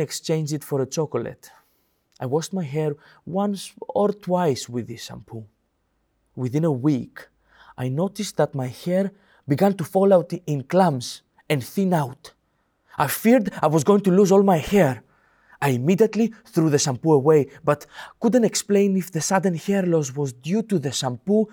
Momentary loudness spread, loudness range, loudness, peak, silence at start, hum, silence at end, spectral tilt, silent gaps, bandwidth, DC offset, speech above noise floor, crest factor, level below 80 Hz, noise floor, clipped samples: 14 LU; 8 LU; -22 LUFS; -6 dBFS; 0 s; none; 0.05 s; -6 dB/octave; none; over 20 kHz; under 0.1%; 49 dB; 16 dB; -58 dBFS; -70 dBFS; under 0.1%